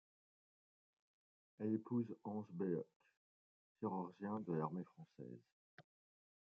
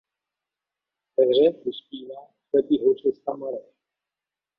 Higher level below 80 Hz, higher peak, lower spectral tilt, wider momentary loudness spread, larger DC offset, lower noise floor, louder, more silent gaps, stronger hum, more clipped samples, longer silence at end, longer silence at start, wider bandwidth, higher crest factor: second, under -90 dBFS vs -70 dBFS; second, -28 dBFS vs -8 dBFS; about the same, -10 dB/octave vs -9 dB/octave; second, 15 LU vs 19 LU; neither; about the same, under -90 dBFS vs -89 dBFS; second, -45 LUFS vs -23 LUFS; first, 2.96-3.00 s, 3.17-3.75 s, 5.52-5.78 s vs none; neither; neither; second, 0.65 s vs 1 s; first, 1.6 s vs 1.2 s; first, 5.4 kHz vs 4.9 kHz; about the same, 20 dB vs 18 dB